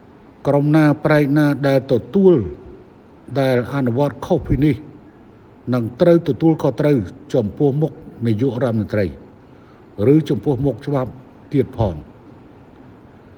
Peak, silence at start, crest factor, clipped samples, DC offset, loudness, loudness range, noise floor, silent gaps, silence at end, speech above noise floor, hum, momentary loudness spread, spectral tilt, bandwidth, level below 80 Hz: 0 dBFS; 0.45 s; 18 dB; under 0.1%; under 0.1%; -18 LUFS; 4 LU; -44 dBFS; none; 1.05 s; 28 dB; none; 10 LU; -9 dB/octave; 18.5 kHz; -42 dBFS